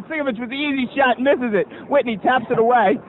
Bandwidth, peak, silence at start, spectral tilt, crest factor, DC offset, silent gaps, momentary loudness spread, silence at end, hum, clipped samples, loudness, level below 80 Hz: 4.2 kHz; -4 dBFS; 0 s; -8 dB/octave; 14 dB; under 0.1%; none; 8 LU; 0 s; none; under 0.1%; -19 LUFS; -58 dBFS